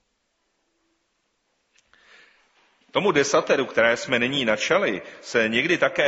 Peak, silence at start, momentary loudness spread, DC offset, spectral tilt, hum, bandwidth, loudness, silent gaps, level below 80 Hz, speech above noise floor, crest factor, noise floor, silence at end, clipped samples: -4 dBFS; 2.95 s; 6 LU; under 0.1%; -2 dB/octave; none; 8 kHz; -22 LUFS; none; -64 dBFS; 51 dB; 20 dB; -73 dBFS; 0 s; under 0.1%